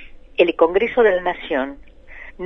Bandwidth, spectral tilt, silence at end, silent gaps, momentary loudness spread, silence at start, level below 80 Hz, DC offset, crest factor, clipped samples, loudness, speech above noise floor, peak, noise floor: 5.8 kHz; -6.5 dB/octave; 0 s; none; 16 LU; 0 s; -44 dBFS; under 0.1%; 18 dB; under 0.1%; -18 LUFS; 21 dB; -2 dBFS; -39 dBFS